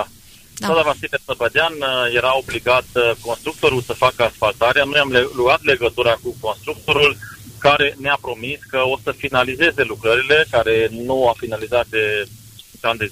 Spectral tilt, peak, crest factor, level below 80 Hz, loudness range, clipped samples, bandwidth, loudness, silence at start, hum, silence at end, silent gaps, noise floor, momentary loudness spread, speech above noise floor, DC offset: -4 dB/octave; -2 dBFS; 16 dB; -46 dBFS; 2 LU; under 0.1%; 15.5 kHz; -17 LUFS; 0 s; none; 0 s; none; -44 dBFS; 10 LU; 26 dB; under 0.1%